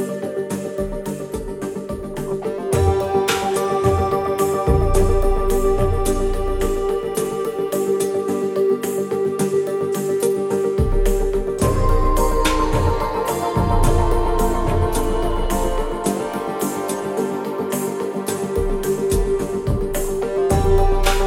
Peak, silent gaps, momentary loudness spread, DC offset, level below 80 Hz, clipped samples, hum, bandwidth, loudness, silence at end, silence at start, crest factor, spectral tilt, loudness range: -2 dBFS; none; 7 LU; under 0.1%; -24 dBFS; under 0.1%; none; 16.5 kHz; -21 LUFS; 0 s; 0 s; 16 dB; -5.5 dB/octave; 4 LU